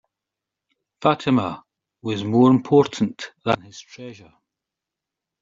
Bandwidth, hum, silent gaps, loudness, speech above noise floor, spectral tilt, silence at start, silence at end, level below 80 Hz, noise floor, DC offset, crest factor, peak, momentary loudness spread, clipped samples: 7.6 kHz; none; none; -20 LUFS; 66 dB; -6 dB/octave; 1 s; 1.3 s; -62 dBFS; -86 dBFS; under 0.1%; 20 dB; -2 dBFS; 23 LU; under 0.1%